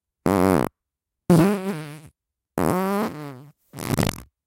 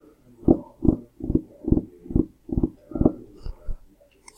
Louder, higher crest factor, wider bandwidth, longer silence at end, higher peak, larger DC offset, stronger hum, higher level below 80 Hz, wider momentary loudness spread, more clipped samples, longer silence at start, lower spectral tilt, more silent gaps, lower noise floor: first, -22 LUFS vs -25 LUFS; about the same, 20 dB vs 24 dB; first, 17 kHz vs 9 kHz; second, 0.25 s vs 0.6 s; about the same, -2 dBFS vs -2 dBFS; neither; neither; second, -48 dBFS vs -34 dBFS; about the same, 18 LU vs 19 LU; neither; second, 0.25 s vs 0.4 s; second, -6.5 dB/octave vs -11 dB/octave; neither; first, -85 dBFS vs -53 dBFS